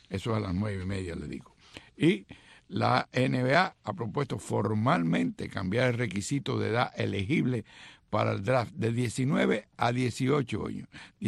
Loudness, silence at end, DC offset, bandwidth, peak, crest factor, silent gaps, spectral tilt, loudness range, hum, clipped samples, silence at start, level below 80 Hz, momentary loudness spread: -29 LUFS; 0 s; under 0.1%; 12.5 kHz; -8 dBFS; 20 dB; none; -6 dB/octave; 2 LU; none; under 0.1%; 0.1 s; -58 dBFS; 10 LU